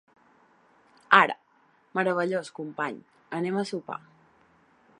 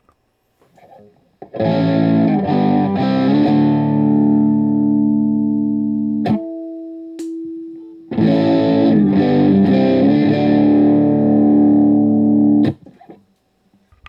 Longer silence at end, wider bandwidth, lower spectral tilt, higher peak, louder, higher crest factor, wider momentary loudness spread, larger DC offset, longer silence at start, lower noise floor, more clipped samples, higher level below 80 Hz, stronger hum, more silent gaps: about the same, 1 s vs 0.95 s; first, 11 kHz vs 5.6 kHz; second, -5 dB/octave vs -9.5 dB/octave; about the same, -2 dBFS vs -2 dBFS; second, -26 LUFS vs -14 LUFS; first, 28 dB vs 12 dB; first, 20 LU vs 16 LU; neither; second, 1.1 s vs 1.4 s; about the same, -64 dBFS vs -63 dBFS; neither; second, -80 dBFS vs -56 dBFS; neither; neither